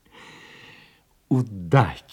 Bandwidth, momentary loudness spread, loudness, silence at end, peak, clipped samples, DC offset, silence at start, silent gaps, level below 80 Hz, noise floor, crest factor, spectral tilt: 10 kHz; 25 LU; -22 LUFS; 0.15 s; -4 dBFS; under 0.1%; under 0.1%; 1.3 s; none; -54 dBFS; -57 dBFS; 22 dB; -8 dB/octave